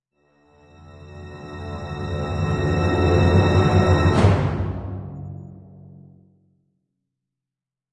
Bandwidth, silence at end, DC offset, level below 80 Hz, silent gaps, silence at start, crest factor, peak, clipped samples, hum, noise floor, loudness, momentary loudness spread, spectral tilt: 9.8 kHz; 2.35 s; under 0.1%; -38 dBFS; none; 0.95 s; 18 dB; -4 dBFS; under 0.1%; none; -88 dBFS; -20 LUFS; 22 LU; -7.5 dB/octave